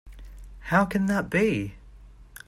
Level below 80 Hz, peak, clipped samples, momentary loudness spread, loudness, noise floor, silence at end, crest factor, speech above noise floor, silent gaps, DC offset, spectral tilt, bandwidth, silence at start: -46 dBFS; -8 dBFS; under 0.1%; 13 LU; -25 LUFS; -48 dBFS; 0.25 s; 20 dB; 24 dB; none; under 0.1%; -6.5 dB/octave; 15.5 kHz; 0.05 s